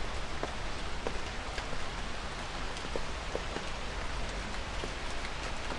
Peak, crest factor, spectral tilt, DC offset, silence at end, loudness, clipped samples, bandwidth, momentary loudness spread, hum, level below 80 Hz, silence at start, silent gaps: -18 dBFS; 18 dB; -3.5 dB/octave; under 0.1%; 0 s; -38 LUFS; under 0.1%; 11.5 kHz; 1 LU; none; -42 dBFS; 0 s; none